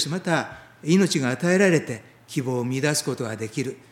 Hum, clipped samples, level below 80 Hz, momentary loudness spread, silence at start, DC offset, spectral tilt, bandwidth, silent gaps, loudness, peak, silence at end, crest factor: none; under 0.1%; -66 dBFS; 14 LU; 0 s; under 0.1%; -5 dB/octave; 16.5 kHz; none; -23 LUFS; -4 dBFS; 0.15 s; 18 dB